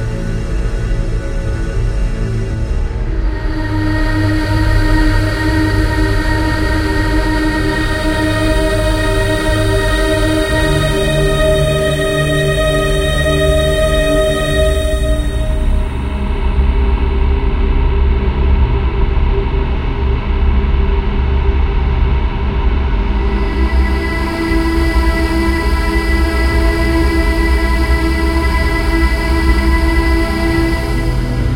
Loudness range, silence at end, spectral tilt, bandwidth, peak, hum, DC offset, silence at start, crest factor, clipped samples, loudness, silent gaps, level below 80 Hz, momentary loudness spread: 3 LU; 0 s; -6 dB/octave; 16.5 kHz; 0 dBFS; none; 0.9%; 0 s; 12 dB; under 0.1%; -15 LUFS; none; -16 dBFS; 6 LU